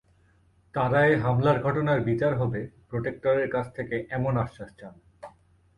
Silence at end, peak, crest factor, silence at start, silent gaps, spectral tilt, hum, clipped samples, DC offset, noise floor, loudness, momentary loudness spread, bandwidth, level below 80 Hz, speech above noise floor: 0.5 s; -10 dBFS; 18 dB; 0.75 s; none; -9 dB/octave; none; under 0.1%; under 0.1%; -62 dBFS; -26 LUFS; 13 LU; 11 kHz; -54 dBFS; 37 dB